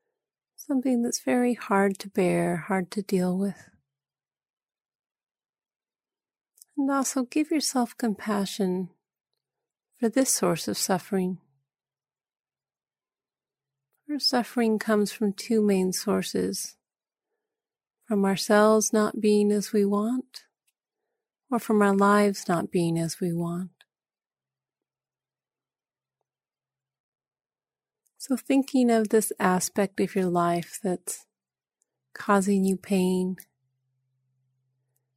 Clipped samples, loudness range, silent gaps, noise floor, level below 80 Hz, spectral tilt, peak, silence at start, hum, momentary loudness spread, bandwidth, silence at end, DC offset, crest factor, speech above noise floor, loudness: under 0.1%; 9 LU; 4.50-4.57 s, 4.95-4.99 s, 5.49-5.53 s, 5.76-5.80 s, 27.00-27.12 s; under -90 dBFS; -72 dBFS; -5 dB/octave; -8 dBFS; 0.6 s; none; 10 LU; 16 kHz; 1.8 s; under 0.1%; 20 dB; over 65 dB; -25 LUFS